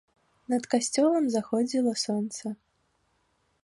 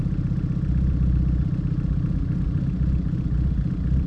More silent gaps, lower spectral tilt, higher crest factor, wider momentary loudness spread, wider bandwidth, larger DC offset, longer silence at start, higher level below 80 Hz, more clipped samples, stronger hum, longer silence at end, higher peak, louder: neither; second, -4 dB/octave vs -10.5 dB/octave; first, 20 dB vs 10 dB; first, 12 LU vs 3 LU; first, 11.5 kHz vs 5.2 kHz; neither; first, 0.5 s vs 0 s; second, -74 dBFS vs -26 dBFS; neither; neither; first, 1.1 s vs 0 s; about the same, -10 dBFS vs -12 dBFS; second, -27 LUFS vs -24 LUFS